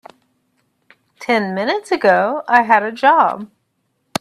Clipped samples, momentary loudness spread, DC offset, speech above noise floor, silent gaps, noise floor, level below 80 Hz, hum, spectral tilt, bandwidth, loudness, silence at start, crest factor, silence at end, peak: under 0.1%; 16 LU; under 0.1%; 53 dB; none; -68 dBFS; -66 dBFS; none; -4.5 dB/octave; 13.5 kHz; -15 LUFS; 1.2 s; 18 dB; 0.75 s; 0 dBFS